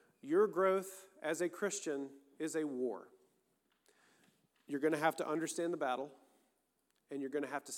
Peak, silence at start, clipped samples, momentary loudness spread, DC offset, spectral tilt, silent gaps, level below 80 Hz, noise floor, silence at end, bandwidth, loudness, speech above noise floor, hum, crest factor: -18 dBFS; 0.25 s; under 0.1%; 12 LU; under 0.1%; -4 dB/octave; none; under -90 dBFS; -81 dBFS; 0 s; 17.5 kHz; -38 LUFS; 44 dB; none; 20 dB